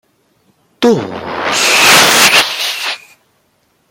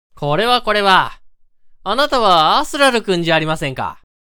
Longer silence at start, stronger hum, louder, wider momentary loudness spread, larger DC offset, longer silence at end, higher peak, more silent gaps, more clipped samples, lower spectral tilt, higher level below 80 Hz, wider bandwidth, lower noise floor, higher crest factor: first, 0.8 s vs 0.15 s; neither; first, -9 LUFS vs -15 LUFS; first, 15 LU vs 12 LU; neither; first, 0.95 s vs 0.25 s; about the same, 0 dBFS vs 0 dBFS; neither; first, 0.2% vs under 0.1%; second, -1 dB/octave vs -4 dB/octave; second, -54 dBFS vs -40 dBFS; about the same, over 20 kHz vs over 20 kHz; first, -58 dBFS vs -45 dBFS; about the same, 14 dB vs 16 dB